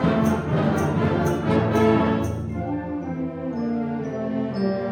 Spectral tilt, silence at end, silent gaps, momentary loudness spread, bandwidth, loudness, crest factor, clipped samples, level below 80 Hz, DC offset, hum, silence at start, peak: -7.5 dB/octave; 0 s; none; 9 LU; 16.5 kHz; -23 LUFS; 16 dB; under 0.1%; -44 dBFS; under 0.1%; none; 0 s; -8 dBFS